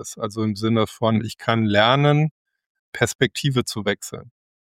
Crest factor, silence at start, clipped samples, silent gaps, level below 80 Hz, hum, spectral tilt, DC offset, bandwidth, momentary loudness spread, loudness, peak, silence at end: 20 dB; 0 s; under 0.1%; 2.31-2.45 s, 2.66-2.93 s, 3.15-3.19 s; -58 dBFS; none; -5.5 dB/octave; under 0.1%; 16 kHz; 12 LU; -21 LUFS; -2 dBFS; 0.35 s